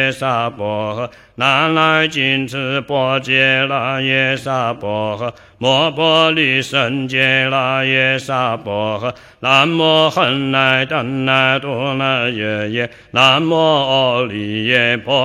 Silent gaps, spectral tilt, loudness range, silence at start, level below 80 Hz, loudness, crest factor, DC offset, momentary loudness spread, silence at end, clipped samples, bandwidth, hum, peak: none; -5 dB/octave; 2 LU; 0 s; -56 dBFS; -15 LUFS; 16 dB; under 0.1%; 9 LU; 0 s; under 0.1%; 14 kHz; none; 0 dBFS